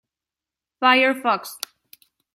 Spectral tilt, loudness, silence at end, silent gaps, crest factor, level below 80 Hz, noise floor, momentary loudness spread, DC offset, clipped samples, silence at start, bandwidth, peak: -2 dB/octave; -19 LUFS; 0.8 s; none; 20 dB; -76 dBFS; -89 dBFS; 18 LU; under 0.1%; under 0.1%; 0.8 s; 16.5 kHz; -2 dBFS